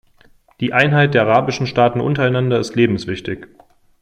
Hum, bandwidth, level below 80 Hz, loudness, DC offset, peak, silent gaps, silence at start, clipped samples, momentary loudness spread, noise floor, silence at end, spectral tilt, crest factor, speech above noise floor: none; 9.4 kHz; -50 dBFS; -16 LUFS; under 0.1%; 0 dBFS; none; 0.6 s; under 0.1%; 12 LU; -51 dBFS; 0.55 s; -6.5 dB/octave; 16 dB; 35 dB